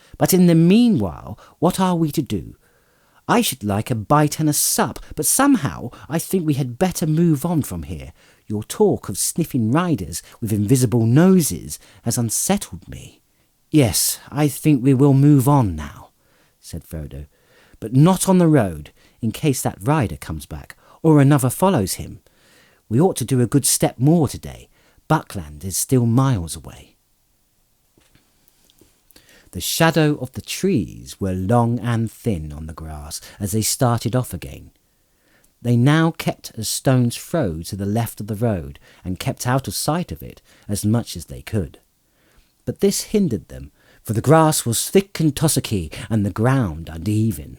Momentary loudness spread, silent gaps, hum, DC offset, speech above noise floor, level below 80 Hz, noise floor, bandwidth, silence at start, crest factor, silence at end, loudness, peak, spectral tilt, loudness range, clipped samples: 18 LU; none; none; under 0.1%; 44 dB; -46 dBFS; -62 dBFS; over 20 kHz; 0.2 s; 16 dB; 0.05 s; -19 LUFS; -2 dBFS; -5.5 dB/octave; 6 LU; under 0.1%